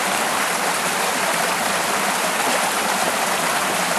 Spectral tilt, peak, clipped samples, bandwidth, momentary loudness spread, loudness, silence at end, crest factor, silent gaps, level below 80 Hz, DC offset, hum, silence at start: -1 dB/octave; -6 dBFS; under 0.1%; 13 kHz; 1 LU; -19 LUFS; 0 s; 14 dB; none; -60 dBFS; under 0.1%; none; 0 s